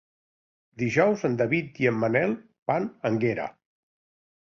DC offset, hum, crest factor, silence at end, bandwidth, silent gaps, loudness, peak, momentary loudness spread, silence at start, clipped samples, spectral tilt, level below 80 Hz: under 0.1%; none; 20 dB; 0.9 s; 7.6 kHz; 2.62-2.66 s; -26 LUFS; -8 dBFS; 9 LU; 0.8 s; under 0.1%; -7 dB/octave; -64 dBFS